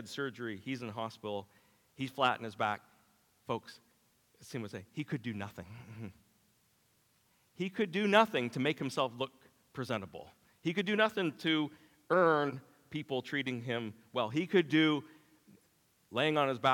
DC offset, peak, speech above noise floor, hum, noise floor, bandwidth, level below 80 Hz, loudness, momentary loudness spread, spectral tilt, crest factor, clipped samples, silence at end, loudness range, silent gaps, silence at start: under 0.1%; -10 dBFS; 38 dB; none; -72 dBFS; 18 kHz; -80 dBFS; -34 LUFS; 17 LU; -5.5 dB/octave; 24 dB; under 0.1%; 0 s; 11 LU; none; 0 s